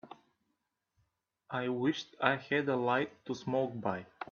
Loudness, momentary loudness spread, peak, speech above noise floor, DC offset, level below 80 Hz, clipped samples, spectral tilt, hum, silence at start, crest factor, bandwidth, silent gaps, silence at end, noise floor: -34 LUFS; 8 LU; -10 dBFS; 50 dB; under 0.1%; -76 dBFS; under 0.1%; -6 dB/octave; none; 0.05 s; 26 dB; 7.2 kHz; none; 0.1 s; -83 dBFS